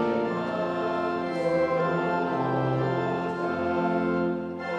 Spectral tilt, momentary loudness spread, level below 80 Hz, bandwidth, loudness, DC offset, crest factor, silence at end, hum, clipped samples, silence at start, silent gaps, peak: -8 dB/octave; 3 LU; -60 dBFS; 9.2 kHz; -27 LUFS; under 0.1%; 16 dB; 0 s; none; under 0.1%; 0 s; none; -12 dBFS